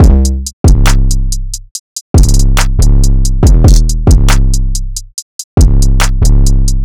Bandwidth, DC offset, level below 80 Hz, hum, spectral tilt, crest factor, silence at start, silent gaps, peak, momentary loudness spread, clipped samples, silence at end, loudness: 16.5 kHz; 4%; -8 dBFS; none; -5 dB/octave; 6 dB; 0 s; 0.53-0.64 s, 1.71-2.14 s, 5.22-5.57 s; 0 dBFS; 13 LU; under 0.1%; 0 s; -11 LUFS